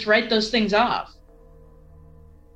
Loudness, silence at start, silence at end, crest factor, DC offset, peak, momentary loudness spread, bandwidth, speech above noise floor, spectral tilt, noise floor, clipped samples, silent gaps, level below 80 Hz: -21 LUFS; 0 s; 1.5 s; 18 dB; under 0.1%; -6 dBFS; 10 LU; 8.8 kHz; 28 dB; -4.5 dB/octave; -48 dBFS; under 0.1%; none; -48 dBFS